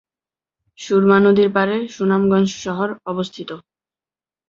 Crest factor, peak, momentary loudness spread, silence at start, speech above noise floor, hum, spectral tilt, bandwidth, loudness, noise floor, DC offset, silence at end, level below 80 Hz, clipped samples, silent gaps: 18 dB; -2 dBFS; 19 LU; 0.8 s; over 73 dB; none; -6.5 dB/octave; 7.6 kHz; -17 LUFS; under -90 dBFS; under 0.1%; 0.9 s; -58 dBFS; under 0.1%; none